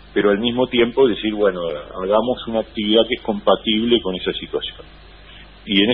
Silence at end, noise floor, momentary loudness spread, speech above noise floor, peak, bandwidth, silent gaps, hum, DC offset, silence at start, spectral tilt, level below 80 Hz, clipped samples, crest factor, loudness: 0 s; -42 dBFS; 10 LU; 23 dB; -2 dBFS; 4.5 kHz; none; none; 0.1%; 0.15 s; -10 dB/octave; -44 dBFS; under 0.1%; 18 dB; -19 LUFS